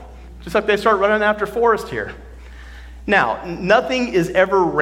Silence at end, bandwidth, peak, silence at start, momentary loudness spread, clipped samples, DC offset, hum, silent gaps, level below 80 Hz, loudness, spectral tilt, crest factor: 0 s; 16.5 kHz; 0 dBFS; 0 s; 13 LU; under 0.1%; under 0.1%; none; none; -40 dBFS; -17 LUFS; -5.5 dB/octave; 18 dB